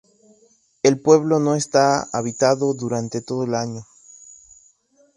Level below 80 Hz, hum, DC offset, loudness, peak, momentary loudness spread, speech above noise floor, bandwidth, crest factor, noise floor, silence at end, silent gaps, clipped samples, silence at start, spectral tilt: -62 dBFS; none; under 0.1%; -20 LUFS; -2 dBFS; 10 LU; 40 dB; 11.5 kHz; 20 dB; -59 dBFS; 1.35 s; none; under 0.1%; 0.85 s; -5 dB/octave